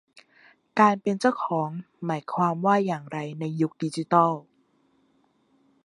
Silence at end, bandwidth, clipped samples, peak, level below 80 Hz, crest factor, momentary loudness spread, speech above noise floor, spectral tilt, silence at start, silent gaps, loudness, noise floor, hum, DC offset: 1.45 s; 11.5 kHz; under 0.1%; -4 dBFS; -76 dBFS; 22 dB; 11 LU; 42 dB; -7 dB/octave; 0.15 s; none; -25 LUFS; -66 dBFS; none; under 0.1%